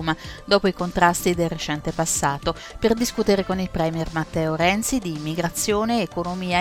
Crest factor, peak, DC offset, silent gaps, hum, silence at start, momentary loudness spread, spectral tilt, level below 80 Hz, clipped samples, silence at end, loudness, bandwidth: 20 dB; -2 dBFS; under 0.1%; none; none; 0 s; 7 LU; -4 dB/octave; -40 dBFS; under 0.1%; 0 s; -22 LUFS; 18.5 kHz